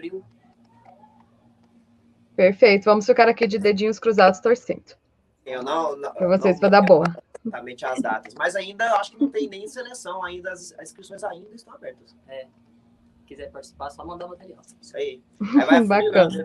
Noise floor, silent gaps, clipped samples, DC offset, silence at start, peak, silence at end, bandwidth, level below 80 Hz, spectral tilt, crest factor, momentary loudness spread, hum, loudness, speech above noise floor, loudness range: -58 dBFS; none; under 0.1%; under 0.1%; 0.05 s; 0 dBFS; 0 s; 11.5 kHz; -62 dBFS; -5.5 dB/octave; 22 dB; 24 LU; none; -20 LUFS; 37 dB; 21 LU